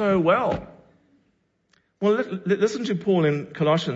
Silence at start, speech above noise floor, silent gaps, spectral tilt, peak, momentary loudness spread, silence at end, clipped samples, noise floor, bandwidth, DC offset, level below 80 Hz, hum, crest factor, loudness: 0 s; 46 dB; none; -6.5 dB/octave; -8 dBFS; 6 LU; 0 s; under 0.1%; -68 dBFS; 8 kHz; under 0.1%; -56 dBFS; none; 16 dB; -23 LUFS